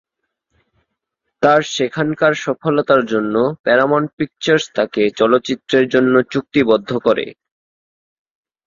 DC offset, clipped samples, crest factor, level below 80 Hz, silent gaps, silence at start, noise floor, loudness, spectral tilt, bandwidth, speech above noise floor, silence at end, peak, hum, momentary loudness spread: under 0.1%; under 0.1%; 16 dB; -56 dBFS; 3.59-3.64 s, 4.13-4.18 s; 1.4 s; -75 dBFS; -16 LUFS; -5.5 dB/octave; 7.6 kHz; 60 dB; 1.35 s; -2 dBFS; none; 6 LU